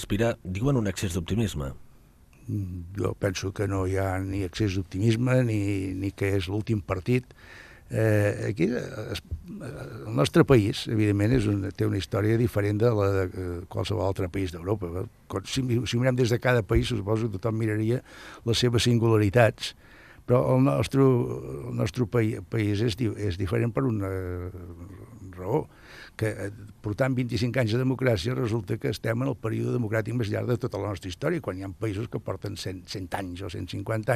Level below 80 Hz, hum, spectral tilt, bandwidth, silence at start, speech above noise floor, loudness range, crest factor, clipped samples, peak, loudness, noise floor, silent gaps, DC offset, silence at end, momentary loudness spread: -48 dBFS; none; -6.5 dB/octave; 14.5 kHz; 0 s; 28 dB; 6 LU; 20 dB; under 0.1%; -6 dBFS; -27 LUFS; -54 dBFS; none; under 0.1%; 0 s; 13 LU